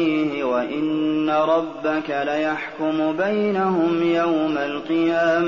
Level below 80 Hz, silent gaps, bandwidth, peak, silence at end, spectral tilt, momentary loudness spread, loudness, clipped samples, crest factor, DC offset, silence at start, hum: -62 dBFS; none; 7 kHz; -8 dBFS; 0 s; -4 dB/octave; 5 LU; -21 LUFS; under 0.1%; 12 dB; 0.2%; 0 s; none